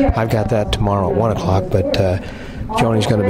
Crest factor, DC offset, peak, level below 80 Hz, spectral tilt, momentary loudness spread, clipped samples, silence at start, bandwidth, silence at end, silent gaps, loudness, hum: 14 dB; under 0.1%; -2 dBFS; -28 dBFS; -7 dB/octave; 7 LU; under 0.1%; 0 s; 15.5 kHz; 0 s; none; -17 LUFS; none